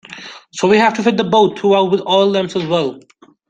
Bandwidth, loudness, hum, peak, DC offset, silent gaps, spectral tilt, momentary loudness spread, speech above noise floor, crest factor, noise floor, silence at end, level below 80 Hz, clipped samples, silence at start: 9.2 kHz; -14 LUFS; none; -2 dBFS; under 0.1%; none; -5 dB/octave; 13 LU; 21 dB; 14 dB; -35 dBFS; 0.5 s; -58 dBFS; under 0.1%; 0.1 s